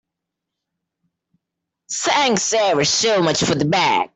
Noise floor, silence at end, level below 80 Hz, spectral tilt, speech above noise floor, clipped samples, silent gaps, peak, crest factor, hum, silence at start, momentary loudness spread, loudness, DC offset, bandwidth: -82 dBFS; 0.1 s; -56 dBFS; -3 dB/octave; 64 dB; under 0.1%; none; -4 dBFS; 16 dB; none; 1.9 s; 3 LU; -17 LUFS; under 0.1%; 8.4 kHz